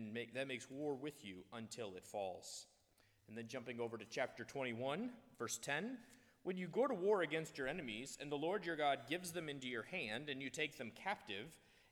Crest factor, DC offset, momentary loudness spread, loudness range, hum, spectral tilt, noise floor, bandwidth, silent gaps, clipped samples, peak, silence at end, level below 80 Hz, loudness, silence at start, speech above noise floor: 20 dB; under 0.1%; 12 LU; 7 LU; none; -4 dB/octave; -75 dBFS; 18.5 kHz; none; under 0.1%; -26 dBFS; 0.35 s; -80 dBFS; -44 LUFS; 0 s; 31 dB